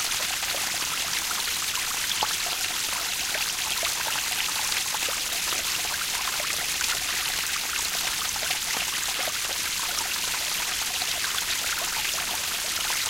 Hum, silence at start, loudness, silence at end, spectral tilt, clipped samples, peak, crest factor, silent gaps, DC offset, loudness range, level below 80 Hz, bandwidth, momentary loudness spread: none; 0 s; -25 LUFS; 0 s; 1 dB/octave; under 0.1%; -10 dBFS; 18 dB; none; under 0.1%; 0 LU; -54 dBFS; 17 kHz; 1 LU